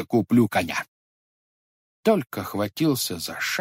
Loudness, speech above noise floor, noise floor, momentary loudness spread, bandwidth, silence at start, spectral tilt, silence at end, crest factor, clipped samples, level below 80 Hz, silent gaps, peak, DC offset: -24 LUFS; over 67 dB; under -90 dBFS; 10 LU; 16 kHz; 0 s; -5 dB/octave; 0 s; 18 dB; under 0.1%; -62 dBFS; 0.88-2.03 s; -6 dBFS; under 0.1%